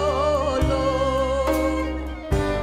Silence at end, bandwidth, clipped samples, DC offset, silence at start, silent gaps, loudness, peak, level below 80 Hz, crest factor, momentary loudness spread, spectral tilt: 0 s; 16 kHz; under 0.1%; under 0.1%; 0 s; none; -23 LUFS; -10 dBFS; -30 dBFS; 12 dB; 5 LU; -6 dB/octave